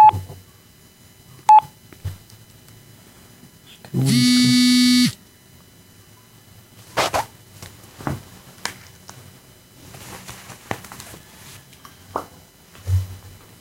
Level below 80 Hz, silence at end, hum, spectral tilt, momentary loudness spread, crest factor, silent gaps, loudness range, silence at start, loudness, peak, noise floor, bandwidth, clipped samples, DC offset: -50 dBFS; 0.45 s; none; -4 dB/octave; 28 LU; 18 dB; none; 17 LU; 0 s; -19 LUFS; -4 dBFS; -50 dBFS; 16.5 kHz; under 0.1%; under 0.1%